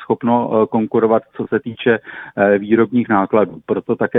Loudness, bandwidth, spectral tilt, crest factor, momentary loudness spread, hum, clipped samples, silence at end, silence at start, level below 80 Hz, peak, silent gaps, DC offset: -17 LUFS; 3.9 kHz; -10.5 dB/octave; 16 dB; 7 LU; none; under 0.1%; 0 s; 0 s; -56 dBFS; -2 dBFS; none; under 0.1%